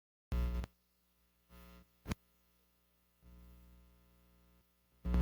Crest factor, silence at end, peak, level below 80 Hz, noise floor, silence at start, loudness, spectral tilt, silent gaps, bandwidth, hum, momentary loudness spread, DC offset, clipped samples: 22 dB; 0 s; -22 dBFS; -46 dBFS; -76 dBFS; 0.3 s; -44 LUFS; -7 dB/octave; none; 17 kHz; 60 Hz at -65 dBFS; 25 LU; under 0.1%; under 0.1%